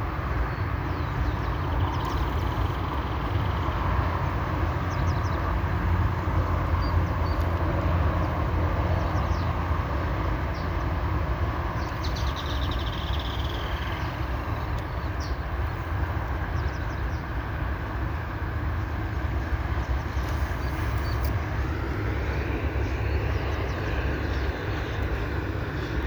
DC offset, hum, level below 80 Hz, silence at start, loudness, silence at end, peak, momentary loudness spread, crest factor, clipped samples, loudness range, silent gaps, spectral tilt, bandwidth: under 0.1%; none; -30 dBFS; 0 s; -28 LUFS; 0 s; -14 dBFS; 4 LU; 14 dB; under 0.1%; 4 LU; none; -7 dB/octave; over 20 kHz